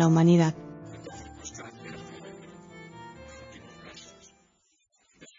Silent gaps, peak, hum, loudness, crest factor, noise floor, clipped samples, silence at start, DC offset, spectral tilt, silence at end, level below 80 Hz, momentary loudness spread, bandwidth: none; -10 dBFS; none; -23 LUFS; 20 dB; -70 dBFS; under 0.1%; 0 s; under 0.1%; -7 dB/octave; 2.3 s; -60 dBFS; 26 LU; 7.6 kHz